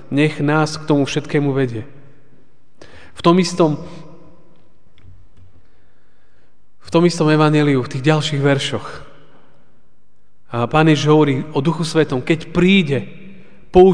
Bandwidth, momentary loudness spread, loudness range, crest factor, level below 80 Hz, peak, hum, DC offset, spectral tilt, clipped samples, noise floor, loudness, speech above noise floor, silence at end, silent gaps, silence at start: 10 kHz; 10 LU; 5 LU; 18 dB; -46 dBFS; 0 dBFS; none; 2%; -6.5 dB/octave; under 0.1%; -62 dBFS; -16 LUFS; 47 dB; 0 s; none; 0.1 s